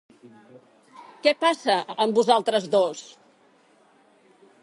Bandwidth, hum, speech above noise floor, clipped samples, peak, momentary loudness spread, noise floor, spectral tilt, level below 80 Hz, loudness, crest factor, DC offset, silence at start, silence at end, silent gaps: 11.5 kHz; none; 36 dB; under 0.1%; -4 dBFS; 4 LU; -59 dBFS; -3.5 dB/octave; -80 dBFS; -22 LUFS; 22 dB; under 0.1%; 1 s; 1.6 s; none